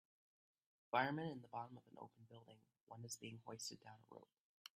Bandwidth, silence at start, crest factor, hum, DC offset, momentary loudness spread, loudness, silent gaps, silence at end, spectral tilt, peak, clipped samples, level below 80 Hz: 14 kHz; 0.95 s; 26 dB; none; under 0.1%; 23 LU; -47 LUFS; 2.83-2.87 s; 0.5 s; -4 dB/octave; -24 dBFS; under 0.1%; -90 dBFS